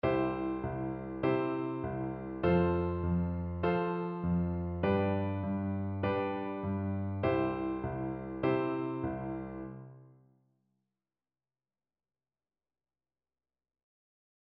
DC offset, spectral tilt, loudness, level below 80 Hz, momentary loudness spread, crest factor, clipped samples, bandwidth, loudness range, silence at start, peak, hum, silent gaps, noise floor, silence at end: under 0.1%; -7.5 dB/octave; -34 LUFS; -54 dBFS; 8 LU; 18 dB; under 0.1%; 5.2 kHz; 8 LU; 0.05 s; -18 dBFS; none; none; under -90 dBFS; 4.45 s